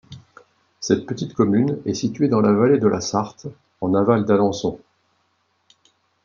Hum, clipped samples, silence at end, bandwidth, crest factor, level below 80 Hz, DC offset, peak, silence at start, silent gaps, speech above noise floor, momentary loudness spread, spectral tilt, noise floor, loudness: none; under 0.1%; 1.45 s; 7.4 kHz; 20 dB; -60 dBFS; under 0.1%; -2 dBFS; 0.1 s; none; 48 dB; 15 LU; -6.5 dB/octave; -67 dBFS; -20 LUFS